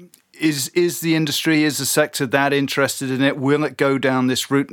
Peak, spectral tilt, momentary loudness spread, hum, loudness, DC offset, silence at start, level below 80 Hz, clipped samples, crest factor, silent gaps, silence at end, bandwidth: -2 dBFS; -4 dB/octave; 3 LU; none; -19 LUFS; under 0.1%; 0 s; -72 dBFS; under 0.1%; 18 dB; none; 0.05 s; 18 kHz